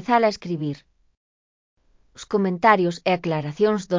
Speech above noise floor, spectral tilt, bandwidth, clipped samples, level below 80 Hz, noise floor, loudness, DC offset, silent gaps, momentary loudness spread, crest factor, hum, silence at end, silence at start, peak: over 69 dB; -6.5 dB/octave; 7.6 kHz; under 0.1%; -62 dBFS; under -90 dBFS; -22 LUFS; under 0.1%; 1.17-1.77 s; 12 LU; 20 dB; none; 0 s; 0 s; -2 dBFS